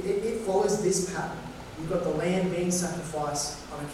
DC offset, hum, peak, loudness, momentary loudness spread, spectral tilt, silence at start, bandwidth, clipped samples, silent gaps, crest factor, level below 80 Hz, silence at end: under 0.1%; none; -14 dBFS; -29 LUFS; 11 LU; -4.5 dB/octave; 0 s; 15.5 kHz; under 0.1%; none; 14 dB; -50 dBFS; 0 s